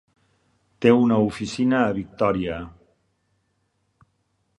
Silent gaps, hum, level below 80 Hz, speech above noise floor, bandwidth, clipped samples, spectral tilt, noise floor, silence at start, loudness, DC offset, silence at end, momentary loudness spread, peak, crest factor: none; none; -52 dBFS; 50 dB; 11 kHz; under 0.1%; -7 dB/octave; -71 dBFS; 0.8 s; -21 LUFS; under 0.1%; 1.9 s; 12 LU; -2 dBFS; 22 dB